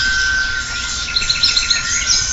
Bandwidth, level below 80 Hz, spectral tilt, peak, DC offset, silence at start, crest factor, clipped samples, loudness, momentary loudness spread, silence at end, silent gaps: 8 kHz; -32 dBFS; 1 dB/octave; 0 dBFS; under 0.1%; 0 s; 16 dB; under 0.1%; -15 LUFS; 7 LU; 0 s; none